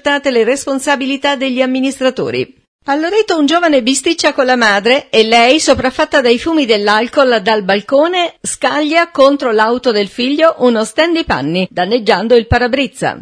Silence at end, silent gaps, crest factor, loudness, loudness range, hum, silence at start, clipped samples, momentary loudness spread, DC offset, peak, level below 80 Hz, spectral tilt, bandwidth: 0 s; 2.68-2.79 s; 12 dB; -12 LUFS; 3 LU; none; 0.05 s; 0.2%; 6 LU; under 0.1%; 0 dBFS; -40 dBFS; -3.5 dB/octave; 11 kHz